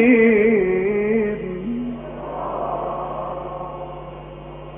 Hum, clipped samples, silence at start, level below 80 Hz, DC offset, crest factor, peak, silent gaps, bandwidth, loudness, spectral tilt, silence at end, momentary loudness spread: none; under 0.1%; 0 s; -44 dBFS; under 0.1%; 18 dB; -4 dBFS; none; 3.6 kHz; -21 LUFS; -6.5 dB/octave; 0 s; 20 LU